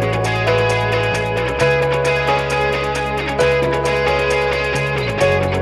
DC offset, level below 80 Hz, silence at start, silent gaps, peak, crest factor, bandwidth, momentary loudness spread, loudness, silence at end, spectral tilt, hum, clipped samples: under 0.1%; -34 dBFS; 0 s; none; -4 dBFS; 14 dB; 13.5 kHz; 3 LU; -17 LUFS; 0 s; -5 dB/octave; none; under 0.1%